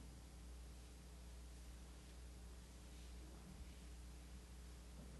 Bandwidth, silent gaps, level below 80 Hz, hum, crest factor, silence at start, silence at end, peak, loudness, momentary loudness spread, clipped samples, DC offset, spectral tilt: 12 kHz; none; -58 dBFS; none; 12 dB; 0 s; 0 s; -46 dBFS; -59 LUFS; 1 LU; under 0.1%; under 0.1%; -4.5 dB/octave